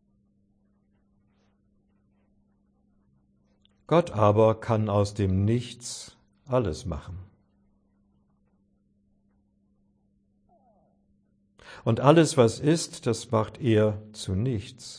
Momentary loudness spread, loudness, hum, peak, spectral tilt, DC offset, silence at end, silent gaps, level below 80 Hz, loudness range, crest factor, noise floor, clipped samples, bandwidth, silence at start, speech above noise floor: 17 LU; -25 LUFS; none; -4 dBFS; -6.5 dB/octave; under 0.1%; 0 s; none; -54 dBFS; 11 LU; 24 dB; -68 dBFS; under 0.1%; 10.5 kHz; 3.9 s; 44 dB